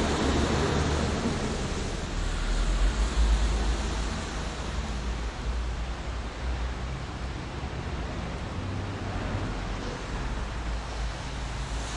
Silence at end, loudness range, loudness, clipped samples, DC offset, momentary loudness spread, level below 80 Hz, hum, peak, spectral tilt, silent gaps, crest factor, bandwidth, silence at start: 0 s; 6 LU; -31 LUFS; under 0.1%; under 0.1%; 9 LU; -32 dBFS; none; -14 dBFS; -5 dB/octave; none; 16 dB; 11 kHz; 0 s